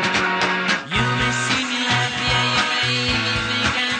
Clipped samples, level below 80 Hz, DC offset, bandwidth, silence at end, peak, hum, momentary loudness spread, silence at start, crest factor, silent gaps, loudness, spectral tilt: under 0.1%; -42 dBFS; under 0.1%; 10 kHz; 0 s; -6 dBFS; none; 2 LU; 0 s; 16 dB; none; -19 LUFS; -3 dB/octave